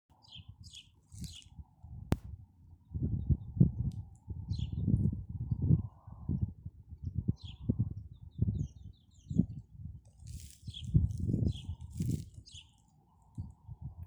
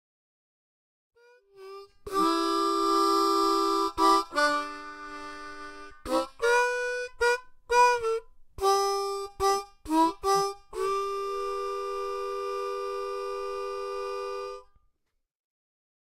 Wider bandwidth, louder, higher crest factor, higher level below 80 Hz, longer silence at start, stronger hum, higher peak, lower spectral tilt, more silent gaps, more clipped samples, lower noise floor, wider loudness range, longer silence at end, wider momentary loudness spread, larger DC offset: first, over 20 kHz vs 16 kHz; second, -36 LUFS vs -27 LUFS; first, 26 dB vs 18 dB; first, -46 dBFS vs -56 dBFS; second, 0.3 s vs 1.55 s; neither; about the same, -12 dBFS vs -10 dBFS; first, -8 dB/octave vs -2.5 dB/octave; neither; neither; second, -66 dBFS vs -77 dBFS; second, 5 LU vs 8 LU; second, 0 s vs 1.4 s; first, 20 LU vs 17 LU; neither